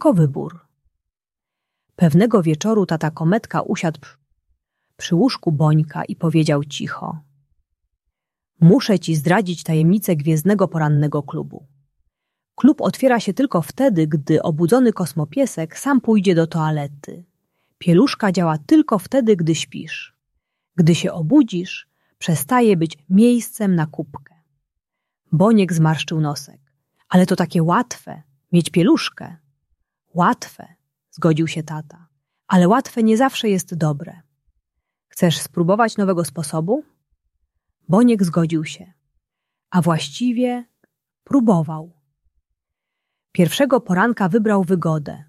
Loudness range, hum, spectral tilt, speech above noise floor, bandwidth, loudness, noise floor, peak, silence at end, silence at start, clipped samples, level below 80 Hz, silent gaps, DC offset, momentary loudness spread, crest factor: 4 LU; none; -6.5 dB/octave; 70 dB; 14 kHz; -18 LUFS; -87 dBFS; -2 dBFS; 0.05 s; 0 s; under 0.1%; -60 dBFS; none; under 0.1%; 14 LU; 18 dB